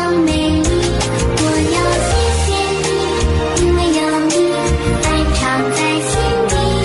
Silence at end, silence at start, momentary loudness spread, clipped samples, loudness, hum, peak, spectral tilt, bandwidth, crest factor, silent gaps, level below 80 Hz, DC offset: 0 s; 0 s; 2 LU; under 0.1%; -15 LUFS; none; -4 dBFS; -4.5 dB/octave; 11.5 kHz; 10 dB; none; -22 dBFS; under 0.1%